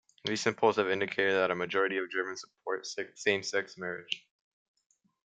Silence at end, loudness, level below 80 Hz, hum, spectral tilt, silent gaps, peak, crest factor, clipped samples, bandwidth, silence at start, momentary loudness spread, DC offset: 1.15 s; -31 LUFS; -78 dBFS; none; -3.5 dB/octave; none; -12 dBFS; 22 dB; under 0.1%; 9.2 kHz; 0.25 s; 11 LU; under 0.1%